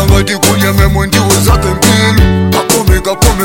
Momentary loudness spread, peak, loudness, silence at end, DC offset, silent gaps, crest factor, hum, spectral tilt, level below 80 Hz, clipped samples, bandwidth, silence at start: 2 LU; 0 dBFS; -9 LUFS; 0 s; 0.8%; none; 8 dB; none; -4.5 dB/octave; -14 dBFS; 0.5%; 17.5 kHz; 0 s